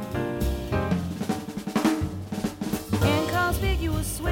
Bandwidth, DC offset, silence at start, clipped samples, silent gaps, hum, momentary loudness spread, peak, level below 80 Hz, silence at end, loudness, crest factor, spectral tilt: 17 kHz; under 0.1%; 0 s; under 0.1%; none; none; 8 LU; -10 dBFS; -36 dBFS; 0 s; -27 LUFS; 16 dB; -5.5 dB/octave